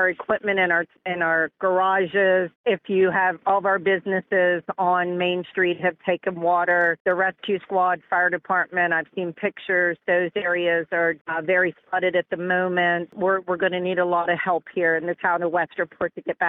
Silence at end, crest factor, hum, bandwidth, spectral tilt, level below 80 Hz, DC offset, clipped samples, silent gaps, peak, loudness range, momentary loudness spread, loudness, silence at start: 0 s; 14 dB; none; 4 kHz; -8 dB/octave; -68 dBFS; under 0.1%; under 0.1%; 2.55-2.64 s, 7.00-7.05 s, 11.21-11.25 s; -8 dBFS; 2 LU; 5 LU; -22 LUFS; 0 s